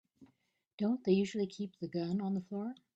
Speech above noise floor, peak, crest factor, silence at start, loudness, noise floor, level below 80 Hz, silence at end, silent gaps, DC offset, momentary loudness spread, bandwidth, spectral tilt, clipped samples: 42 dB; -18 dBFS; 18 dB; 0.2 s; -36 LUFS; -77 dBFS; -76 dBFS; 0.2 s; 0.73-0.78 s; under 0.1%; 10 LU; 8.2 kHz; -7.5 dB/octave; under 0.1%